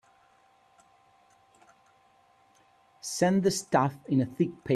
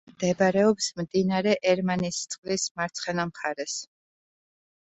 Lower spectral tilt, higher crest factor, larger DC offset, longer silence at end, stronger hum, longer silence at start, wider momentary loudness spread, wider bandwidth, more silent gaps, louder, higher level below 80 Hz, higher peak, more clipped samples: about the same, -5.5 dB/octave vs -4.5 dB/octave; about the same, 22 dB vs 18 dB; neither; second, 0 s vs 1 s; neither; first, 3.05 s vs 0.2 s; about the same, 8 LU vs 9 LU; first, 13.5 kHz vs 8.4 kHz; second, none vs 2.38-2.43 s, 2.71-2.75 s; about the same, -28 LUFS vs -26 LUFS; about the same, -68 dBFS vs -64 dBFS; about the same, -10 dBFS vs -10 dBFS; neither